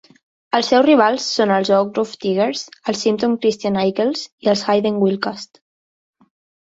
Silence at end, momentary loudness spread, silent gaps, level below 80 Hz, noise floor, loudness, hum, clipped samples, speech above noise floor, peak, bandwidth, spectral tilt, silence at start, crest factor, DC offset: 1.2 s; 10 LU; 4.32-4.38 s; -62 dBFS; under -90 dBFS; -18 LUFS; none; under 0.1%; over 73 dB; -2 dBFS; 8 kHz; -5 dB/octave; 0.55 s; 16 dB; under 0.1%